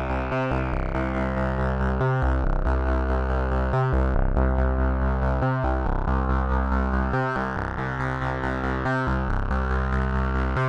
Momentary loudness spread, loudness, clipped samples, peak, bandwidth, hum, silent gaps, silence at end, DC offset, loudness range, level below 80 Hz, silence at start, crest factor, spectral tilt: 3 LU; -25 LUFS; under 0.1%; -8 dBFS; 6.2 kHz; none; none; 0 s; under 0.1%; 2 LU; -26 dBFS; 0 s; 14 dB; -8.5 dB/octave